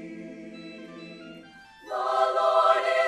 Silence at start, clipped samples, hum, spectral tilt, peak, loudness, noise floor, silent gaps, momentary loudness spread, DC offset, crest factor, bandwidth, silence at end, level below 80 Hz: 0 s; under 0.1%; none; -3.5 dB/octave; -8 dBFS; -23 LUFS; -49 dBFS; none; 22 LU; under 0.1%; 20 dB; 11.5 kHz; 0 s; -70 dBFS